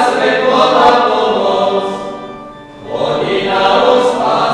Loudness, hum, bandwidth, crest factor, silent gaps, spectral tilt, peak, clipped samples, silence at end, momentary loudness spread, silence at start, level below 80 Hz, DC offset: -12 LUFS; none; 12 kHz; 12 dB; none; -4.5 dB/octave; 0 dBFS; 0.2%; 0 s; 18 LU; 0 s; -48 dBFS; under 0.1%